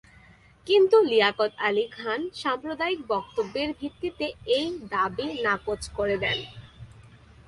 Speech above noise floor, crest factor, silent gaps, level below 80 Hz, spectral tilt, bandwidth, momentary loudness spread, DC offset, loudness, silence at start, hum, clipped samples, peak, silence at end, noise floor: 29 dB; 20 dB; none; -54 dBFS; -4.5 dB/octave; 11.5 kHz; 13 LU; under 0.1%; -26 LUFS; 0.65 s; none; under 0.1%; -6 dBFS; 0.5 s; -54 dBFS